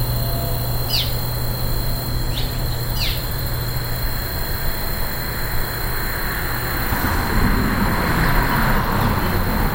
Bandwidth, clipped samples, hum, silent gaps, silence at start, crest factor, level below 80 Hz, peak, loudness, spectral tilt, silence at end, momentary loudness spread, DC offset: 16 kHz; under 0.1%; none; none; 0 s; 16 dB; -24 dBFS; -4 dBFS; -21 LUFS; -4.5 dB/octave; 0 s; 5 LU; under 0.1%